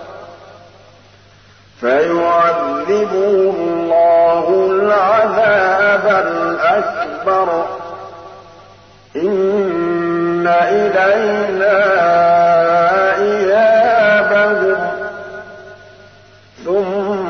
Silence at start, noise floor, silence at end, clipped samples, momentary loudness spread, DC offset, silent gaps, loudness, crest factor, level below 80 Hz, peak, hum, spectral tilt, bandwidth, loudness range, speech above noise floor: 0 s; -45 dBFS; 0 s; under 0.1%; 11 LU; 0.1%; none; -13 LUFS; 12 dB; -56 dBFS; -2 dBFS; none; -6 dB/octave; 6.6 kHz; 6 LU; 32 dB